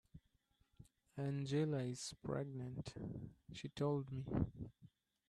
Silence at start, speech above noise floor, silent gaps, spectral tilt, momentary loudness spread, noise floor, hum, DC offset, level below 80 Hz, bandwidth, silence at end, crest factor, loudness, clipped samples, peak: 0.15 s; 36 dB; none; -6.5 dB/octave; 14 LU; -79 dBFS; none; under 0.1%; -64 dBFS; 12 kHz; 0.45 s; 22 dB; -44 LUFS; under 0.1%; -24 dBFS